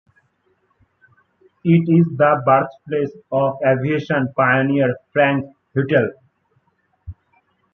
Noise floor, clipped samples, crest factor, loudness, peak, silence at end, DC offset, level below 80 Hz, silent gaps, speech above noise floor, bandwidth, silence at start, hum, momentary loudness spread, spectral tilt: -64 dBFS; under 0.1%; 18 dB; -18 LUFS; -2 dBFS; 0.6 s; under 0.1%; -54 dBFS; none; 47 dB; 6 kHz; 1.65 s; none; 9 LU; -9.5 dB/octave